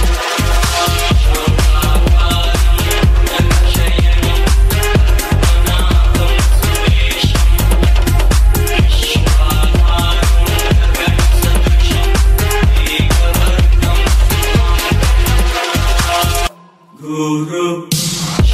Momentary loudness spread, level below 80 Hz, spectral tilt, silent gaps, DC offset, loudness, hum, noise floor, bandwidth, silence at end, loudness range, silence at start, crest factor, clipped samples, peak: 3 LU; -12 dBFS; -4.5 dB/octave; none; under 0.1%; -13 LUFS; none; -41 dBFS; 15.5 kHz; 0 s; 1 LU; 0 s; 10 dB; under 0.1%; 0 dBFS